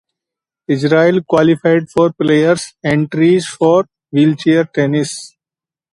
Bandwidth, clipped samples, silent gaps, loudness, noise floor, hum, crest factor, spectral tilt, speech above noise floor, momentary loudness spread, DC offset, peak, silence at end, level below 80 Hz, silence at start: 11.5 kHz; under 0.1%; none; -14 LUFS; -90 dBFS; none; 14 dB; -6.5 dB/octave; 77 dB; 7 LU; under 0.1%; 0 dBFS; 0.65 s; -54 dBFS; 0.7 s